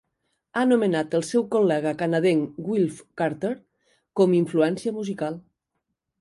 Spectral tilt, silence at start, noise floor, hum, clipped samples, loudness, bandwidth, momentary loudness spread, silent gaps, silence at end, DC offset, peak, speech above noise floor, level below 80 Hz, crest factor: -6.5 dB/octave; 0.55 s; -80 dBFS; none; under 0.1%; -24 LUFS; 11.5 kHz; 10 LU; none; 0.8 s; under 0.1%; -6 dBFS; 57 dB; -68 dBFS; 18 dB